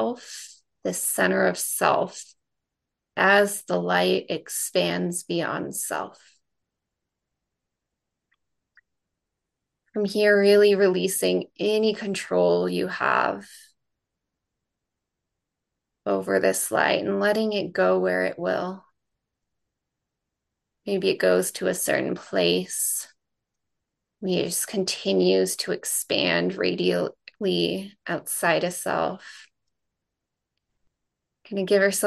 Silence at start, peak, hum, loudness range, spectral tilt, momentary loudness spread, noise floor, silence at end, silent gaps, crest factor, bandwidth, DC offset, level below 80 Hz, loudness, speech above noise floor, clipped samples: 0 s; -4 dBFS; none; 8 LU; -3.5 dB/octave; 12 LU; -84 dBFS; 0 s; none; 20 dB; 13 kHz; under 0.1%; -70 dBFS; -23 LUFS; 61 dB; under 0.1%